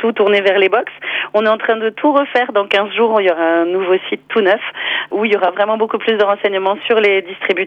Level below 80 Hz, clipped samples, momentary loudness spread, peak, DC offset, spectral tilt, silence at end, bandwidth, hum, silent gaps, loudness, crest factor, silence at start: -64 dBFS; under 0.1%; 5 LU; -2 dBFS; under 0.1%; -5.5 dB/octave; 0 s; 6.6 kHz; none; none; -14 LUFS; 14 dB; 0 s